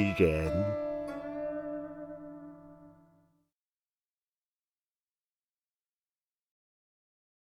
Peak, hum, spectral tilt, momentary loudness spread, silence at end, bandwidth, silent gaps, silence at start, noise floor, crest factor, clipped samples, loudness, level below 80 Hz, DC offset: -12 dBFS; none; -8 dB/octave; 22 LU; 4.6 s; 17 kHz; none; 0 s; under -90 dBFS; 24 dB; under 0.1%; -33 LUFS; -54 dBFS; under 0.1%